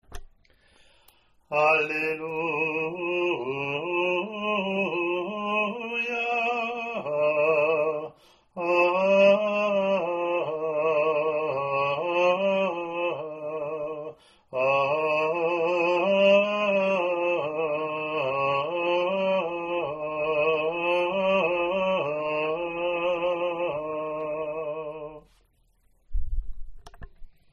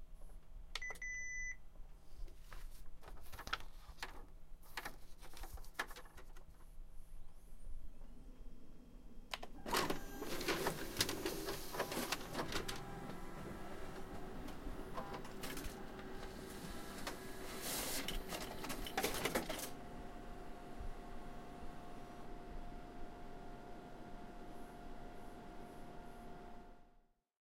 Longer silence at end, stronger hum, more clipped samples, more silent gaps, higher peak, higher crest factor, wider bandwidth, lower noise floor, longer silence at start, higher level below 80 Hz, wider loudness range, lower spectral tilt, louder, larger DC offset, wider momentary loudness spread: second, 0.2 s vs 0.45 s; neither; neither; neither; first, -8 dBFS vs -18 dBFS; second, 18 dB vs 28 dB; second, 7.2 kHz vs 16 kHz; second, -64 dBFS vs -70 dBFS; about the same, 0.1 s vs 0 s; first, -44 dBFS vs -52 dBFS; second, 5 LU vs 13 LU; first, -6 dB/octave vs -3 dB/octave; first, -25 LUFS vs -46 LUFS; neither; second, 11 LU vs 21 LU